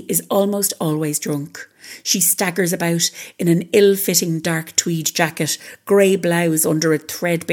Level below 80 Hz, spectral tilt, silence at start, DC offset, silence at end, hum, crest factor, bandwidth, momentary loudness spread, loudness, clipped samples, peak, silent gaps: -70 dBFS; -4 dB/octave; 0 s; under 0.1%; 0 s; none; 18 dB; 19 kHz; 8 LU; -18 LUFS; under 0.1%; 0 dBFS; none